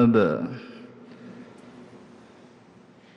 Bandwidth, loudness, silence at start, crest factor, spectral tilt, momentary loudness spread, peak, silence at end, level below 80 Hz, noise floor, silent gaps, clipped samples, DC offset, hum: 6.2 kHz; -25 LUFS; 0 s; 18 dB; -9 dB/octave; 27 LU; -8 dBFS; 1.75 s; -62 dBFS; -52 dBFS; none; under 0.1%; under 0.1%; none